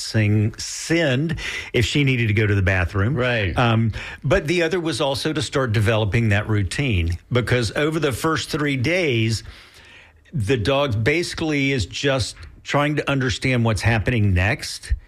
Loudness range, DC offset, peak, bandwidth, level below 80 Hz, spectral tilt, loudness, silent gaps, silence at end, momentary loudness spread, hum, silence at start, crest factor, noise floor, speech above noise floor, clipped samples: 2 LU; under 0.1%; -8 dBFS; 14 kHz; -38 dBFS; -5.5 dB/octave; -21 LUFS; none; 0.05 s; 5 LU; none; 0 s; 12 dB; -48 dBFS; 27 dB; under 0.1%